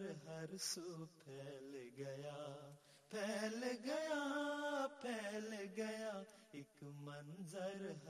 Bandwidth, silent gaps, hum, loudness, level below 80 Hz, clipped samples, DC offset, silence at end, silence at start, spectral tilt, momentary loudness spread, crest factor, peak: 15 kHz; none; none; -47 LUFS; -90 dBFS; under 0.1%; under 0.1%; 0 s; 0 s; -4 dB/octave; 13 LU; 18 dB; -30 dBFS